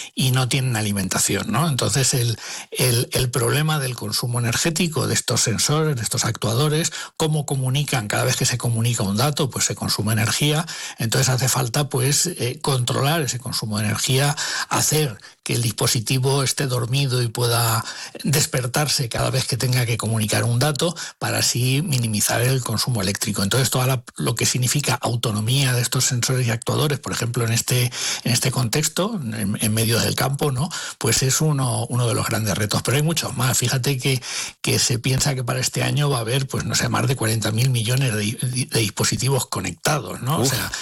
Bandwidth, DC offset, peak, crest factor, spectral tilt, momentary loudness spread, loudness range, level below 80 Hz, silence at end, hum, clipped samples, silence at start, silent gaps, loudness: 17.5 kHz; under 0.1%; -8 dBFS; 12 dB; -4 dB/octave; 5 LU; 1 LU; -50 dBFS; 0 s; none; under 0.1%; 0 s; none; -20 LUFS